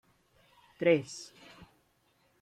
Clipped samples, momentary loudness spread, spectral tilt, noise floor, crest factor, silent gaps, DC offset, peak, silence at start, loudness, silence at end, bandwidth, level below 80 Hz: under 0.1%; 26 LU; -5.5 dB/octave; -71 dBFS; 22 dB; none; under 0.1%; -14 dBFS; 0.8 s; -30 LUFS; 1.15 s; 11.5 kHz; -74 dBFS